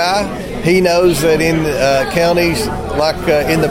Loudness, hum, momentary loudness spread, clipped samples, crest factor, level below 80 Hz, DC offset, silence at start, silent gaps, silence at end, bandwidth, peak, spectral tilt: -14 LUFS; none; 7 LU; under 0.1%; 12 dB; -30 dBFS; under 0.1%; 0 s; none; 0 s; 16.5 kHz; 0 dBFS; -5 dB/octave